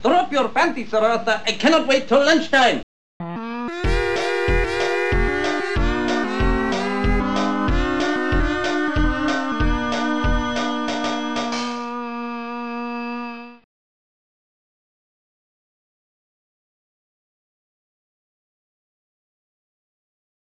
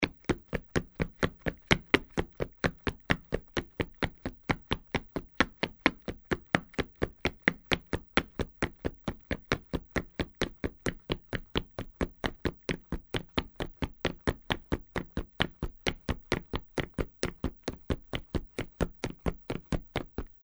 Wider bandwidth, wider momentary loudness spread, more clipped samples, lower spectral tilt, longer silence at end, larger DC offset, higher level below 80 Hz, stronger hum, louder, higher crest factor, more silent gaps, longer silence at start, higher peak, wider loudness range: second, 10 kHz vs over 20 kHz; first, 12 LU vs 8 LU; neither; about the same, -5 dB/octave vs -5 dB/octave; first, 6.8 s vs 0.2 s; first, 2% vs under 0.1%; first, -30 dBFS vs -44 dBFS; neither; first, -21 LUFS vs -34 LUFS; second, 18 dB vs 30 dB; first, 2.83-3.20 s vs none; about the same, 0 s vs 0 s; about the same, -4 dBFS vs -4 dBFS; first, 12 LU vs 5 LU